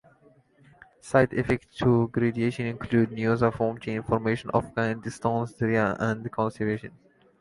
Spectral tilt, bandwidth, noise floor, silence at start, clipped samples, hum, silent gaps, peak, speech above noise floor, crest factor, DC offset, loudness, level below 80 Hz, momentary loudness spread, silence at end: -7.5 dB/octave; 11.5 kHz; -59 dBFS; 1.05 s; under 0.1%; none; none; -6 dBFS; 34 dB; 20 dB; under 0.1%; -26 LUFS; -52 dBFS; 6 LU; 0.5 s